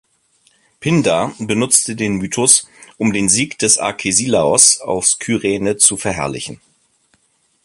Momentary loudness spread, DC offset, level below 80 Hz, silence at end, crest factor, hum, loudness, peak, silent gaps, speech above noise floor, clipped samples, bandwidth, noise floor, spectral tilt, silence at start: 10 LU; under 0.1%; -48 dBFS; 1.1 s; 16 dB; none; -14 LUFS; 0 dBFS; none; 45 dB; under 0.1%; 16 kHz; -61 dBFS; -2.5 dB/octave; 0.8 s